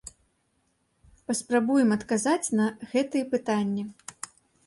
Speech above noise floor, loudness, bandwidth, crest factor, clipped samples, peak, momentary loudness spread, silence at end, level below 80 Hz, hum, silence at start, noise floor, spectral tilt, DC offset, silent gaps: 46 dB; -26 LUFS; 11.5 kHz; 16 dB; under 0.1%; -10 dBFS; 18 LU; 0.55 s; -66 dBFS; none; 0.05 s; -72 dBFS; -4.5 dB/octave; under 0.1%; none